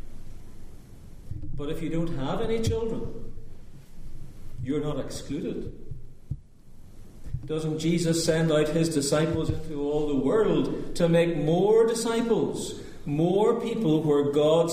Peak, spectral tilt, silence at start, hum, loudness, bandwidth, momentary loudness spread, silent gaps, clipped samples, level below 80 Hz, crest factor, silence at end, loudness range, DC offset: -10 dBFS; -6 dB/octave; 0 s; none; -26 LUFS; 15.5 kHz; 18 LU; none; under 0.1%; -40 dBFS; 16 dB; 0 s; 11 LU; under 0.1%